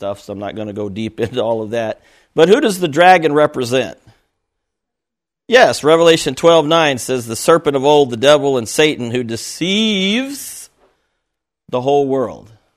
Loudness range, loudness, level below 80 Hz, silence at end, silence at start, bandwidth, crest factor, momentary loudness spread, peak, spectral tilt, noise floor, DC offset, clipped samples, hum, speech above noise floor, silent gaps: 6 LU; -14 LUFS; -54 dBFS; 0.35 s; 0 s; 15 kHz; 16 dB; 14 LU; 0 dBFS; -4 dB/octave; -84 dBFS; under 0.1%; under 0.1%; none; 70 dB; none